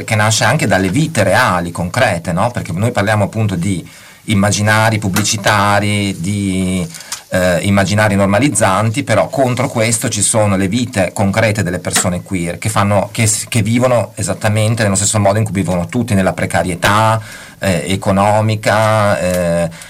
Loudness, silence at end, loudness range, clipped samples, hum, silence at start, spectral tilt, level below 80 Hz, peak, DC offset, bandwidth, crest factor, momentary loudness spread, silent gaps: -14 LUFS; 0 s; 2 LU; under 0.1%; none; 0 s; -4.5 dB/octave; -42 dBFS; -2 dBFS; under 0.1%; 16 kHz; 12 dB; 6 LU; none